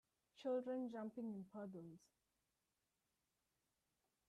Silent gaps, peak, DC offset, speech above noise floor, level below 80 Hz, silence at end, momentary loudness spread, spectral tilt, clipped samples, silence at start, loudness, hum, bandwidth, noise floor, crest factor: none; -36 dBFS; under 0.1%; 42 dB; under -90 dBFS; 2.3 s; 15 LU; -7.5 dB/octave; under 0.1%; 0.35 s; -49 LUFS; none; 12 kHz; -90 dBFS; 18 dB